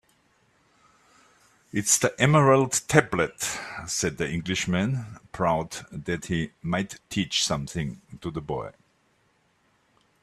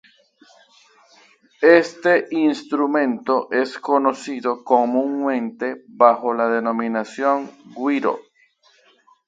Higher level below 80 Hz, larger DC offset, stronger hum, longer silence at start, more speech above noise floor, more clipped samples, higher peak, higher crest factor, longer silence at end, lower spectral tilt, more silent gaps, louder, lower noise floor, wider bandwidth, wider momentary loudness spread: first, -54 dBFS vs -72 dBFS; neither; neither; first, 1.75 s vs 1.6 s; about the same, 41 dB vs 39 dB; neither; about the same, -2 dBFS vs 0 dBFS; first, 26 dB vs 20 dB; first, 1.5 s vs 1.05 s; second, -4 dB/octave vs -5.5 dB/octave; neither; second, -25 LUFS vs -19 LUFS; first, -67 dBFS vs -58 dBFS; first, 14 kHz vs 9 kHz; first, 15 LU vs 10 LU